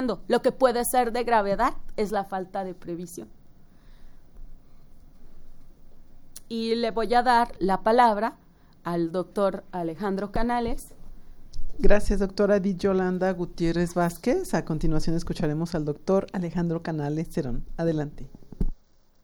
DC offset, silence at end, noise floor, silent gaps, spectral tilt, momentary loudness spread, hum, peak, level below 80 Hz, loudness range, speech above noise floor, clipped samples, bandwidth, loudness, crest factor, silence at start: under 0.1%; 0.5 s; -56 dBFS; none; -6 dB/octave; 13 LU; none; -4 dBFS; -34 dBFS; 10 LU; 32 dB; under 0.1%; over 20 kHz; -26 LUFS; 20 dB; 0 s